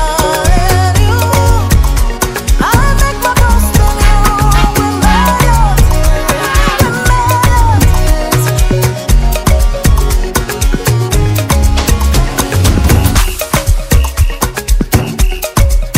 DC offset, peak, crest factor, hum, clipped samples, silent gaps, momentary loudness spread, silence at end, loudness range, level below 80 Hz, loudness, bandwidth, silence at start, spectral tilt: under 0.1%; 0 dBFS; 8 dB; none; 1%; none; 4 LU; 0 s; 2 LU; -12 dBFS; -11 LUFS; 16.5 kHz; 0 s; -4.5 dB/octave